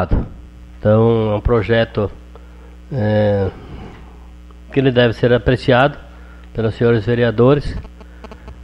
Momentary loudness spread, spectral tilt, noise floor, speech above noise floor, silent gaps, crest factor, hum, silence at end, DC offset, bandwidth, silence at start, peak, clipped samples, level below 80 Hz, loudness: 21 LU; -8.5 dB/octave; -37 dBFS; 23 dB; none; 16 dB; none; 0 s; under 0.1%; 8.2 kHz; 0 s; 0 dBFS; under 0.1%; -30 dBFS; -16 LUFS